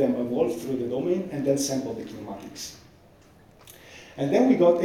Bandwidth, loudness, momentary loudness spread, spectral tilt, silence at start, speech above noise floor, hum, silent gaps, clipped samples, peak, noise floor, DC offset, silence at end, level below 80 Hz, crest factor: 16.5 kHz; -25 LUFS; 18 LU; -5.5 dB/octave; 0 s; 29 dB; none; none; under 0.1%; -6 dBFS; -54 dBFS; under 0.1%; 0 s; -62 dBFS; 18 dB